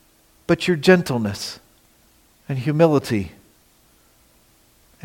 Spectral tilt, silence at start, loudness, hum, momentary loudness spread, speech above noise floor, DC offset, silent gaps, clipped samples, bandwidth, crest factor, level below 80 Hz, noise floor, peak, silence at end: -6 dB/octave; 0.5 s; -20 LUFS; none; 18 LU; 38 dB; under 0.1%; none; under 0.1%; 17 kHz; 22 dB; -56 dBFS; -57 dBFS; -2 dBFS; 1.75 s